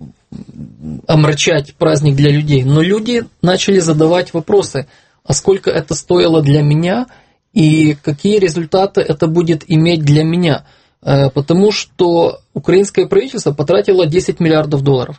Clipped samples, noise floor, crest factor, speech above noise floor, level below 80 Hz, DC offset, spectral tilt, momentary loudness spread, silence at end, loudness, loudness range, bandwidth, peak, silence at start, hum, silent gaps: under 0.1%; -33 dBFS; 12 dB; 21 dB; -42 dBFS; under 0.1%; -6 dB/octave; 7 LU; 0.05 s; -13 LUFS; 1 LU; 8.8 kHz; 0 dBFS; 0 s; none; none